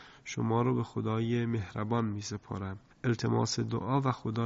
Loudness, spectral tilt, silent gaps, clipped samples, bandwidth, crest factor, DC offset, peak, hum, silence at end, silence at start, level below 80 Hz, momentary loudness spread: -32 LUFS; -6 dB/octave; none; under 0.1%; 8 kHz; 16 dB; under 0.1%; -16 dBFS; none; 0 s; 0 s; -58 dBFS; 9 LU